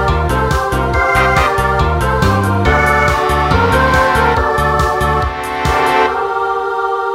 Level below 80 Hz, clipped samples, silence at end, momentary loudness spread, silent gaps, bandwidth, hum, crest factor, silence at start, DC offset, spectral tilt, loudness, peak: -22 dBFS; under 0.1%; 0 s; 5 LU; none; 16 kHz; none; 12 dB; 0 s; under 0.1%; -5.5 dB/octave; -13 LUFS; 0 dBFS